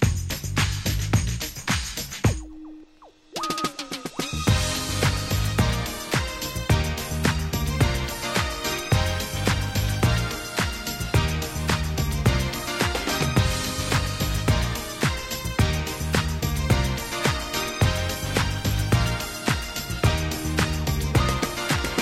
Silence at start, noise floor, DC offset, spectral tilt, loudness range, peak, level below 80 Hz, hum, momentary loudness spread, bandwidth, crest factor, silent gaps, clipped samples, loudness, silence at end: 0 s; -52 dBFS; under 0.1%; -4.5 dB/octave; 3 LU; -6 dBFS; -32 dBFS; none; 5 LU; 16.5 kHz; 18 dB; none; under 0.1%; -25 LUFS; 0 s